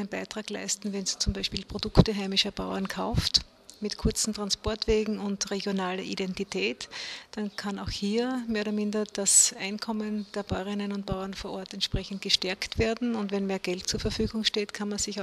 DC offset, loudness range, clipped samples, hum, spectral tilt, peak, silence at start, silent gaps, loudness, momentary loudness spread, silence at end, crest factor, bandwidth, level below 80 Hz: under 0.1%; 5 LU; under 0.1%; none; -3.5 dB/octave; -4 dBFS; 0 s; none; -28 LUFS; 10 LU; 0 s; 26 dB; 14 kHz; -42 dBFS